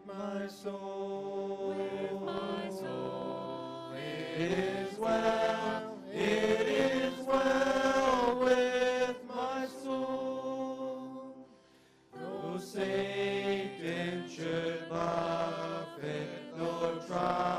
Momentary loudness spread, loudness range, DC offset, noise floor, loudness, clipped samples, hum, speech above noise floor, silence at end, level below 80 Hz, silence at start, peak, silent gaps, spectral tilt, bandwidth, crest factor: 12 LU; 8 LU; under 0.1%; -63 dBFS; -34 LUFS; under 0.1%; none; 30 dB; 0 s; -64 dBFS; 0 s; -16 dBFS; none; -5 dB/octave; 14.5 kHz; 18 dB